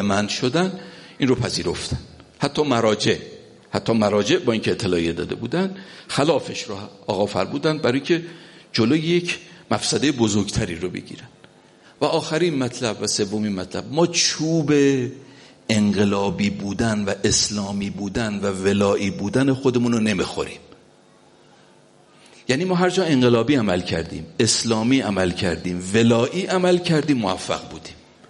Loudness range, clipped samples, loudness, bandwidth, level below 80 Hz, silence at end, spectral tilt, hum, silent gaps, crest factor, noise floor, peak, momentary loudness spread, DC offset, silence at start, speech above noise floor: 4 LU; under 0.1%; -21 LUFS; 11.5 kHz; -48 dBFS; 0.35 s; -4.5 dB/octave; none; none; 20 dB; -52 dBFS; -2 dBFS; 11 LU; under 0.1%; 0 s; 32 dB